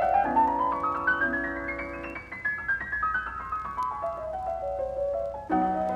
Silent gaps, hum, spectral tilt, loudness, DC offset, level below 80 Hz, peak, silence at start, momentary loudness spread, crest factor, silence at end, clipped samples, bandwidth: none; none; -7 dB/octave; -28 LUFS; under 0.1%; -50 dBFS; -12 dBFS; 0 s; 9 LU; 16 dB; 0 s; under 0.1%; 11 kHz